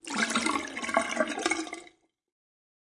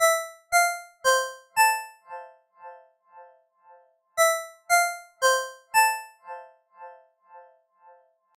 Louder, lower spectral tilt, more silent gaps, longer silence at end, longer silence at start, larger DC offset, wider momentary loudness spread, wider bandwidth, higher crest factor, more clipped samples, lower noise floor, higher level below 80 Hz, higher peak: second, -29 LUFS vs -24 LUFS; first, -2 dB/octave vs 3 dB/octave; neither; about the same, 1 s vs 0.95 s; about the same, 0.05 s vs 0 s; neither; second, 8 LU vs 21 LU; second, 11.5 kHz vs 17 kHz; about the same, 24 dB vs 20 dB; neither; about the same, -58 dBFS vs -57 dBFS; first, -68 dBFS vs -76 dBFS; about the same, -8 dBFS vs -8 dBFS